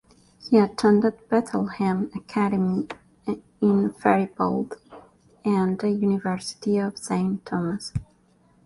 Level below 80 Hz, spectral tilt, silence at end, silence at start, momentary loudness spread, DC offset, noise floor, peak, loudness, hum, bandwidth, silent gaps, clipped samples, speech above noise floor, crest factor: -56 dBFS; -7 dB/octave; 0.65 s; 0.45 s; 12 LU; under 0.1%; -60 dBFS; -6 dBFS; -24 LUFS; none; 11.5 kHz; none; under 0.1%; 37 dB; 20 dB